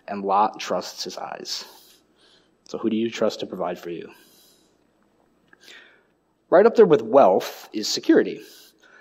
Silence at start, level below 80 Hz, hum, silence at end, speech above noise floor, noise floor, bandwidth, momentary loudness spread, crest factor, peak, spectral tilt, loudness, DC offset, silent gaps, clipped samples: 0.1 s; -76 dBFS; none; 0.6 s; 44 dB; -65 dBFS; 16 kHz; 18 LU; 20 dB; -4 dBFS; -4.5 dB/octave; -21 LUFS; under 0.1%; none; under 0.1%